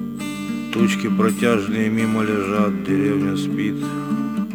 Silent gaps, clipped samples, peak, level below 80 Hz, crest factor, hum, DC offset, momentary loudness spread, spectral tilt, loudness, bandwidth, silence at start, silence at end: none; under 0.1%; -4 dBFS; -54 dBFS; 16 dB; none; under 0.1%; 7 LU; -6 dB/octave; -20 LUFS; 19.5 kHz; 0 s; 0 s